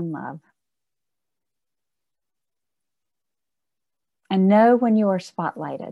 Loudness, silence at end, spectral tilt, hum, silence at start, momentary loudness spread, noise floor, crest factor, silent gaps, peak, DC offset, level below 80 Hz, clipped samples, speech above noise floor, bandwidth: -19 LUFS; 0 s; -8 dB/octave; none; 0 s; 17 LU; -89 dBFS; 20 dB; none; -4 dBFS; under 0.1%; -76 dBFS; under 0.1%; 69 dB; 8 kHz